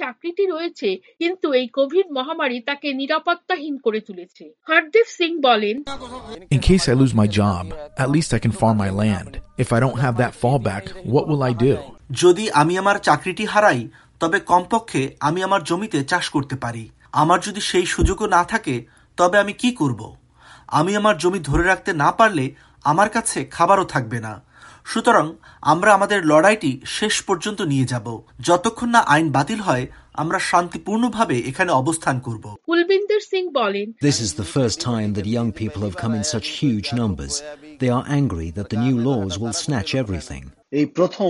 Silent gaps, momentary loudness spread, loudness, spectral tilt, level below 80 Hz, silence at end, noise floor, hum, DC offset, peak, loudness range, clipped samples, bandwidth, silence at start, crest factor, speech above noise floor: none; 11 LU; -20 LUFS; -5 dB/octave; -40 dBFS; 0 s; -46 dBFS; none; under 0.1%; -2 dBFS; 4 LU; under 0.1%; 11.5 kHz; 0 s; 18 dB; 26 dB